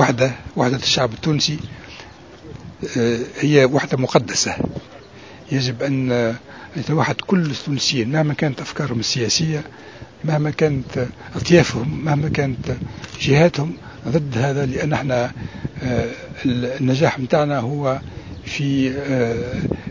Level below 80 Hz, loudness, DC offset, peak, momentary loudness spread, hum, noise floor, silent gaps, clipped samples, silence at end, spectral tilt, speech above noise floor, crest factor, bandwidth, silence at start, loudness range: -44 dBFS; -20 LUFS; 0.2%; 0 dBFS; 15 LU; none; -40 dBFS; none; under 0.1%; 0 s; -5 dB/octave; 21 dB; 20 dB; 7.6 kHz; 0 s; 2 LU